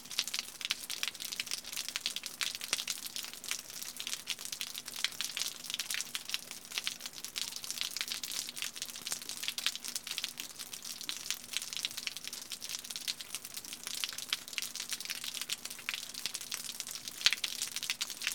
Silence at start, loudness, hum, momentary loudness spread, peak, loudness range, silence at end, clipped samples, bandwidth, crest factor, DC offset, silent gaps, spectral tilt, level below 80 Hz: 0 s; -37 LUFS; none; 5 LU; -8 dBFS; 3 LU; 0 s; under 0.1%; 17.5 kHz; 32 dB; under 0.1%; none; 1.5 dB/octave; -74 dBFS